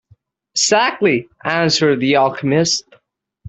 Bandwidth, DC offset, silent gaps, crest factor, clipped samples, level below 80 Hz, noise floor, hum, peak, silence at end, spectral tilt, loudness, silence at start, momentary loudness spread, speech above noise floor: 8.4 kHz; under 0.1%; none; 14 dB; under 0.1%; -58 dBFS; -54 dBFS; none; -2 dBFS; 0 s; -3.5 dB/octave; -16 LUFS; 0.55 s; 7 LU; 39 dB